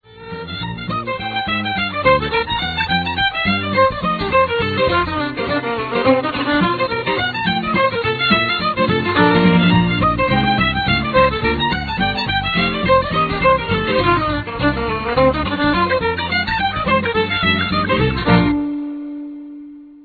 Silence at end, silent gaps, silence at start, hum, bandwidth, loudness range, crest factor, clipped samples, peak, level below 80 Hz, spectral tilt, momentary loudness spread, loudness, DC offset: 0.05 s; none; 0.1 s; none; 4.9 kHz; 3 LU; 18 dB; under 0.1%; 0 dBFS; -34 dBFS; -8 dB/octave; 8 LU; -17 LUFS; under 0.1%